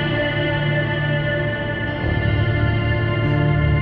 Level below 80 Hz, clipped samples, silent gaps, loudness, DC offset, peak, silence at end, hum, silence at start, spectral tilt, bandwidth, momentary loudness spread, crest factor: -30 dBFS; under 0.1%; none; -20 LUFS; under 0.1%; -6 dBFS; 0 s; none; 0 s; -9.5 dB/octave; 5 kHz; 4 LU; 12 dB